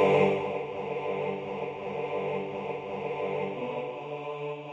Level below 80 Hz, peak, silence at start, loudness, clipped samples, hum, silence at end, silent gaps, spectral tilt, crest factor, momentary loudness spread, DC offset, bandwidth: -68 dBFS; -12 dBFS; 0 s; -32 LUFS; under 0.1%; none; 0 s; none; -7 dB/octave; 20 dB; 9 LU; under 0.1%; 7.8 kHz